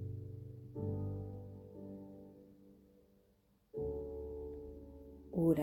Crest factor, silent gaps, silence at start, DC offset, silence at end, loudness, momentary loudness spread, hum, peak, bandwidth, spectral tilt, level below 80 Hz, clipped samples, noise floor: 24 dB; none; 0 s; under 0.1%; 0 s; -44 LUFS; 17 LU; none; -20 dBFS; 16.5 kHz; -10 dB/octave; -58 dBFS; under 0.1%; -73 dBFS